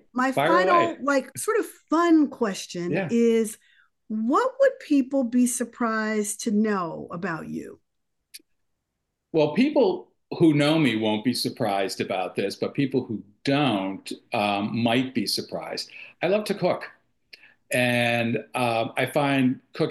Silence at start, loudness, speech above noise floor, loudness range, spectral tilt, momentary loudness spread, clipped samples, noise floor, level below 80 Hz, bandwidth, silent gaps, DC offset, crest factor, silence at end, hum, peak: 0.15 s; -24 LUFS; 56 dB; 4 LU; -5 dB/octave; 11 LU; under 0.1%; -80 dBFS; -70 dBFS; 12.5 kHz; none; under 0.1%; 16 dB; 0 s; none; -8 dBFS